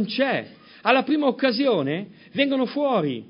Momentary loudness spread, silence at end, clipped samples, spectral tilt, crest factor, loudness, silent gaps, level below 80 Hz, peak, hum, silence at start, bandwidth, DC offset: 9 LU; 0.05 s; under 0.1%; -9.5 dB/octave; 20 dB; -23 LUFS; none; -76 dBFS; -2 dBFS; none; 0 s; 5.4 kHz; under 0.1%